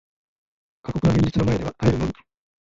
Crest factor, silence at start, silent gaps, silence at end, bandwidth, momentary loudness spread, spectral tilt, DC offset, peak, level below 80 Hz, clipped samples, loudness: 16 dB; 0.85 s; none; 0.5 s; 7.8 kHz; 14 LU; -8 dB/octave; under 0.1%; -6 dBFS; -38 dBFS; under 0.1%; -22 LUFS